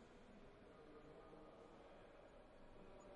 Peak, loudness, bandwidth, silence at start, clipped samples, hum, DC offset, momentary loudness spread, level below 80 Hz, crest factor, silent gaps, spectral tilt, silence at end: -50 dBFS; -64 LUFS; 10 kHz; 0 s; under 0.1%; none; under 0.1%; 2 LU; -70 dBFS; 12 dB; none; -6 dB/octave; 0 s